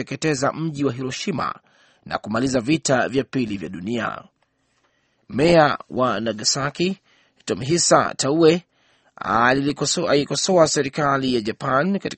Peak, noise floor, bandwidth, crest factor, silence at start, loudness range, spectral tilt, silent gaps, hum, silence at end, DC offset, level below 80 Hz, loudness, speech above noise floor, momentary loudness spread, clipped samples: -2 dBFS; -67 dBFS; 8.8 kHz; 20 dB; 0 s; 5 LU; -4 dB/octave; none; none; 0 s; under 0.1%; -54 dBFS; -20 LUFS; 47 dB; 12 LU; under 0.1%